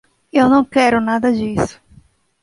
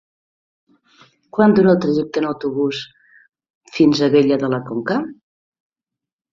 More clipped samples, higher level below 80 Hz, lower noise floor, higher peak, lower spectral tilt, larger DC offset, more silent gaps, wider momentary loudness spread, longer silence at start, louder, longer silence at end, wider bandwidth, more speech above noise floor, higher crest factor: neither; first, -46 dBFS vs -60 dBFS; second, -49 dBFS vs -86 dBFS; about the same, 0 dBFS vs -2 dBFS; about the same, -6 dB/octave vs -7 dB/octave; neither; second, none vs 3.50-3.61 s; second, 8 LU vs 15 LU; second, 0.35 s vs 1.35 s; about the same, -16 LUFS vs -17 LUFS; second, 0.7 s vs 1.2 s; first, 11.5 kHz vs 7.6 kHz; second, 35 dB vs 70 dB; about the same, 16 dB vs 18 dB